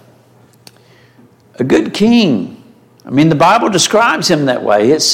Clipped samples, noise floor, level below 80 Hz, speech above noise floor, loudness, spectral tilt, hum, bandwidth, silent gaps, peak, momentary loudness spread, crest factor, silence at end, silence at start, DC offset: under 0.1%; -46 dBFS; -52 dBFS; 35 dB; -11 LUFS; -4 dB/octave; none; 16.5 kHz; none; 0 dBFS; 8 LU; 12 dB; 0 s; 1.6 s; under 0.1%